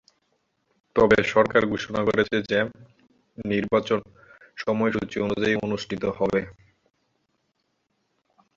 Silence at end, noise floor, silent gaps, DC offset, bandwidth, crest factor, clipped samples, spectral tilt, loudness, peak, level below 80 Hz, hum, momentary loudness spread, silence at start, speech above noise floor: 2.05 s; -74 dBFS; none; under 0.1%; 7.6 kHz; 22 dB; under 0.1%; -6 dB/octave; -24 LUFS; -4 dBFS; -54 dBFS; none; 10 LU; 0.95 s; 50 dB